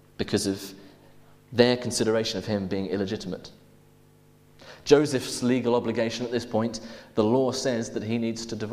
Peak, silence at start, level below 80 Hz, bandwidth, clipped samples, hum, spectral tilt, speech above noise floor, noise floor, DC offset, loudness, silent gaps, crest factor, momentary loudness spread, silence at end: -4 dBFS; 0.2 s; -58 dBFS; 15.5 kHz; under 0.1%; none; -5 dB/octave; 31 dB; -56 dBFS; under 0.1%; -26 LUFS; none; 24 dB; 11 LU; 0 s